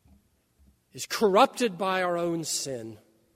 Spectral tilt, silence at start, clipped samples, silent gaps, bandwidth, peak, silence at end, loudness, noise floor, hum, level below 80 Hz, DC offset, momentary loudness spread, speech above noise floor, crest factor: -3.5 dB/octave; 0.95 s; under 0.1%; none; 16 kHz; -6 dBFS; 0.4 s; -26 LUFS; -65 dBFS; none; -68 dBFS; under 0.1%; 17 LU; 38 dB; 22 dB